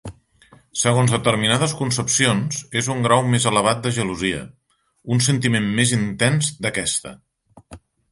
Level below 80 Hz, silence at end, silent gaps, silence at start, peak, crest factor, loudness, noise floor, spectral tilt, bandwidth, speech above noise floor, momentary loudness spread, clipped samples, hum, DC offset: -50 dBFS; 0.35 s; none; 0.05 s; -2 dBFS; 20 dB; -19 LUFS; -53 dBFS; -4 dB/octave; 11.5 kHz; 33 dB; 7 LU; under 0.1%; none; under 0.1%